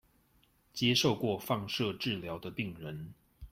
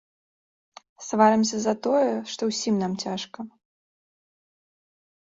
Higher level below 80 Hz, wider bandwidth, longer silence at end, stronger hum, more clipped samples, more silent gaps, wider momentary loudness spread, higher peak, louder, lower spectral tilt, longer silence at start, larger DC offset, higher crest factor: first, -62 dBFS vs -70 dBFS; first, 16 kHz vs 7.8 kHz; second, 0.05 s vs 1.9 s; neither; neither; neither; about the same, 17 LU vs 19 LU; second, -16 dBFS vs -6 dBFS; second, -33 LUFS vs -24 LUFS; about the same, -4.5 dB/octave vs -4.5 dB/octave; second, 0.75 s vs 1 s; neither; about the same, 20 dB vs 22 dB